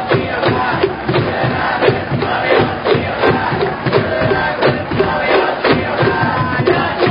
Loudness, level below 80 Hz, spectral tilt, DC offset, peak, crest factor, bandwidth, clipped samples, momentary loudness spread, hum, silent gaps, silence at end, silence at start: -15 LUFS; -36 dBFS; -9.5 dB/octave; under 0.1%; 0 dBFS; 14 dB; 5.4 kHz; under 0.1%; 3 LU; none; none; 0 s; 0 s